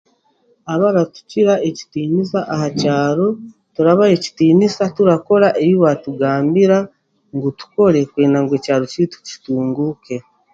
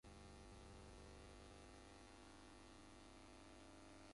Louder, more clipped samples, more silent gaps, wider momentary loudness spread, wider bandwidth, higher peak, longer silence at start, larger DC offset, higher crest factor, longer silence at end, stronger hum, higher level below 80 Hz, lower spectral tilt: first, -16 LUFS vs -63 LUFS; neither; neither; first, 11 LU vs 2 LU; second, 7.8 kHz vs 11.5 kHz; first, 0 dBFS vs -52 dBFS; first, 0.65 s vs 0.05 s; neither; first, 16 dB vs 10 dB; first, 0.35 s vs 0 s; neither; first, -58 dBFS vs -68 dBFS; first, -7 dB/octave vs -4.5 dB/octave